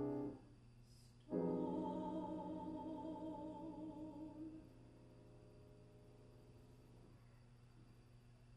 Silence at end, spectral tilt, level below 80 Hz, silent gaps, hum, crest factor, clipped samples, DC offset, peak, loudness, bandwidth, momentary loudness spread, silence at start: 0 s; -9 dB/octave; -70 dBFS; none; none; 20 dB; under 0.1%; under 0.1%; -30 dBFS; -48 LUFS; 11.5 kHz; 22 LU; 0 s